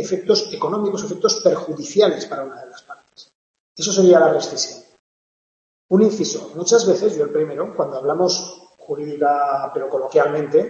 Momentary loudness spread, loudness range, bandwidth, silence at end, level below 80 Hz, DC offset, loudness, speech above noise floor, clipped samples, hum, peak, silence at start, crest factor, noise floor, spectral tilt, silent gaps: 12 LU; 3 LU; 8.2 kHz; 0 s; -68 dBFS; under 0.1%; -19 LUFS; over 72 dB; under 0.1%; none; -2 dBFS; 0 s; 18 dB; under -90 dBFS; -4 dB/octave; 3.35-3.54 s, 3.60-3.75 s, 4.99-5.89 s